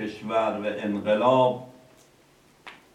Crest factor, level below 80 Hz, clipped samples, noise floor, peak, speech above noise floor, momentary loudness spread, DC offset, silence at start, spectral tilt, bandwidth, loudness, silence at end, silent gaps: 18 dB; -70 dBFS; under 0.1%; -58 dBFS; -8 dBFS; 34 dB; 9 LU; under 0.1%; 0 s; -6.5 dB/octave; 11 kHz; -24 LUFS; 0.2 s; none